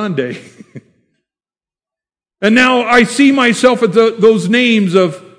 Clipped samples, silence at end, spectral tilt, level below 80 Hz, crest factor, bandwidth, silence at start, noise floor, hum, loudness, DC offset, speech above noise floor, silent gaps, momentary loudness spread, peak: 0.5%; 0.2 s; -5 dB/octave; -54 dBFS; 12 dB; 11 kHz; 0 s; under -90 dBFS; none; -11 LUFS; under 0.1%; over 79 dB; none; 9 LU; 0 dBFS